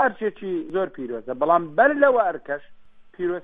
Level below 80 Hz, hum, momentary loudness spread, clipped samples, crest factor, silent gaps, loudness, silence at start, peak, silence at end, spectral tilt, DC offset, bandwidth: -62 dBFS; none; 14 LU; under 0.1%; 18 dB; none; -22 LUFS; 0 s; -4 dBFS; 0 s; -8.5 dB/octave; under 0.1%; 3.9 kHz